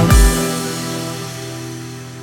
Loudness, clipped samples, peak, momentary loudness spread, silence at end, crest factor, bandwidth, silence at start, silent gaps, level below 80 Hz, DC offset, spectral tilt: -19 LUFS; under 0.1%; 0 dBFS; 16 LU; 0 s; 16 dB; 18.5 kHz; 0 s; none; -20 dBFS; under 0.1%; -4.5 dB/octave